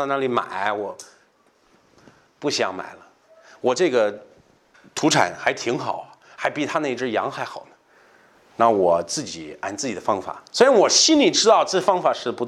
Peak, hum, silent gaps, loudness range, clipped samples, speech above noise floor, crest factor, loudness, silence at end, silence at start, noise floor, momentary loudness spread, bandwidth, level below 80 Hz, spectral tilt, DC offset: 0 dBFS; none; none; 9 LU; under 0.1%; 39 dB; 22 dB; -20 LUFS; 0 s; 0 s; -60 dBFS; 18 LU; 13.5 kHz; -68 dBFS; -2.5 dB/octave; under 0.1%